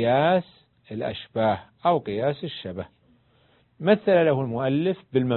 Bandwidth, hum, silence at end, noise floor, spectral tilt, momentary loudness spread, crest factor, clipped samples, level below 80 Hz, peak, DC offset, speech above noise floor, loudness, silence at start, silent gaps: 4.3 kHz; none; 0 s; -62 dBFS; -11 dB/octave; 14 LU; 18 dB; under 0.1%; -58 dBFS; -6 dBFS; under 0.1%; 38 dB; -24 LUFS; 0 s; none